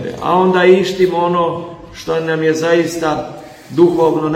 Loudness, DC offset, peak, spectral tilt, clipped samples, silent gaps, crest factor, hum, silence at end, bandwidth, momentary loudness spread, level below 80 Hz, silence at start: -14 LUFS; under 0.1%; 0 dBFS; -6 dB/octave; under 0.1%; none; 14 dB; none; 0 s; 15 kHz; 16 LU; -48 dBFS; 0 s